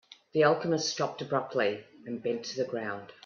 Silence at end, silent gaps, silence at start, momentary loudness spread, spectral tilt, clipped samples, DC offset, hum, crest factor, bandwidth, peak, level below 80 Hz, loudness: 0.15 s; none; 0.35 s; 11 LU; -4.5 dB/octave; under 0.1%; under 0.1%; none; 20 dB; 7.4 kHz; -10 dBFS; -76 dBFS; -30 LUFS